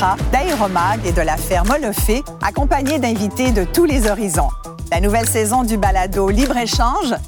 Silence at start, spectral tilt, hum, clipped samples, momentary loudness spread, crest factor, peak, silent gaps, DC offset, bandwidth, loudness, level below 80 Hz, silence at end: 0 s; -4.5 dB/octave; none; under 0.1%; 4 LU; 14 dB; -4 dBFS; none; under 0.1%; over 20 kHz; -17 LUFS; -22 dBFS; 0 s